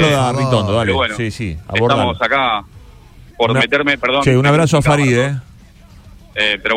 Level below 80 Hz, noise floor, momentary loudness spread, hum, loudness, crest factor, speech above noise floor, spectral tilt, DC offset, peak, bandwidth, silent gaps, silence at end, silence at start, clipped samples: -38 dBFS; -41 dBFS; 9 LU; none; -15 LUFS; 16 dB; 27 dB; -5.5 dB/octave; under 0.1%; 0 dBFS; 15 kHz; none; 0 s; 0 s; under 0.1%